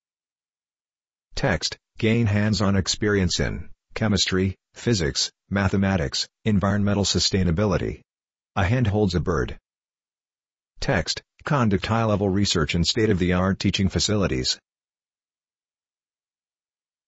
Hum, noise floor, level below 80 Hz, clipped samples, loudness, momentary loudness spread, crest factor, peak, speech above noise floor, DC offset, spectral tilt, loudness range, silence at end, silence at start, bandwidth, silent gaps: none; under -90 dBFS; -40 dBFS; under 0.1%; -23 LUFS; 8 LU; 18 dB; -6 dBFS; over 68 dB; under 0.1%; -5 dB/octave; 4 LU; 2.5 s; 1.35 s; 8.2 kHz; 8.23-8.28 s, 8.46-8.51 s, 10.40-10.44 s, 10.53-10.60 s